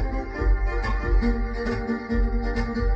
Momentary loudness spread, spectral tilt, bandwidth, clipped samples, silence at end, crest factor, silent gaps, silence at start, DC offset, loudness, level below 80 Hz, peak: 4 LU; -8 dB/octave; 6.2 kHz; under 0.1%; 0 s; 12 dB; none; 0 s; under 0.1%; -26 LUFS; -24 dBFS; -12 dBFS